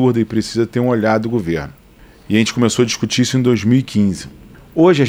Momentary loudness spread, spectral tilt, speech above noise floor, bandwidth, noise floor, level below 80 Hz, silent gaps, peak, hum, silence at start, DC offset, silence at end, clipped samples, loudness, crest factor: 9 LU; -5.5 dB/octave; 28 dB; 15.5 kHz; -42 dBFS; -46 dBFS; none; -2 dBFS; none; 0 s; under 0.1%; 0 s; under 0.1%; -16 LUFS; 14 dB